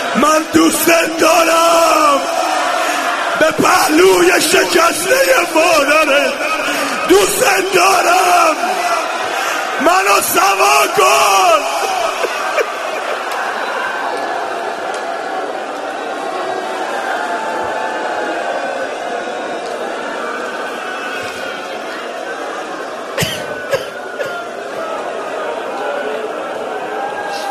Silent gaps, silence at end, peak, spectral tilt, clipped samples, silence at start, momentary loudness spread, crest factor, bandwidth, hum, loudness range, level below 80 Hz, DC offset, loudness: none; 0 s; 0 dBFS; -2 dB/octave; under 0.1%; 0 s; 12 LU; 14 dB; 13.5 kHz; none; 10 LU; -52 dBFS; under 0.1%; -14 LUFS